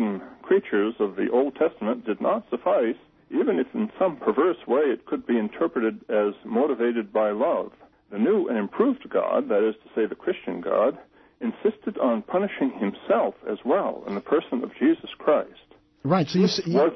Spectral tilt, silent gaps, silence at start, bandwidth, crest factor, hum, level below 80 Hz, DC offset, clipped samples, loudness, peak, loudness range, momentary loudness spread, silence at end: -7 dB/octave; none; 0 s; 6.4 kHz; 16 dB; none; -66 dBFS; under 0.1%; under 0.1%; -25 LUFS; -8 dBFS; 2 LU; 7 LU; 0 s